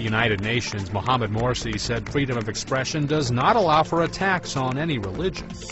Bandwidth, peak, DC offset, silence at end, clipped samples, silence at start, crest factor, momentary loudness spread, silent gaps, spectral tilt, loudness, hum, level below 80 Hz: 8.2 kHz; -6 dBFS; under 0.1%; 0 s; under 0.1%; 0 s; 18 dB; 8 LU; none; -5 dB/octave; -23 LUFS; none; -42 dBFS